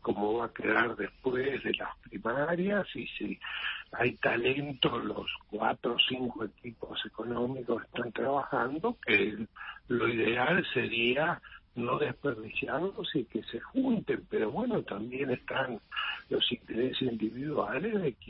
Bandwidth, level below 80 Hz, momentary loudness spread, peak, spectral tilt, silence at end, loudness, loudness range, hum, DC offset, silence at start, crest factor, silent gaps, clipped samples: 5.6 kHz; -62 dBFS; 10 LU; -12 dBFS; -9 dB/octave; 0 s; -32 LUFS; 3 LU; none; under 0.1%; 0.05 s; 20 dB; none; under 0.1%